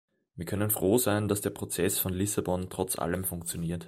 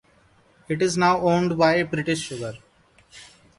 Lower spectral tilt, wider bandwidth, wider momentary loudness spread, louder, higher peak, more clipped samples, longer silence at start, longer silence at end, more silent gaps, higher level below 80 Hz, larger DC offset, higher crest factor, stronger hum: about the same, -4.5 dB/octave vs -5 dB/octave; first, 16 kHz vs 11.5 kHz; second, 8 LU vs 12 LU; second, -29 LUFS vs -22 LUFS; second, -12 dBFS vs -6 dBFS; neither; second, 0.35 s vs 0.7 s; second, 0 s vs 0.35 s; neither; about the same, -56 dBFS vs -56 dBFS; neither; about the same, 18 dB vs 18 dB; neither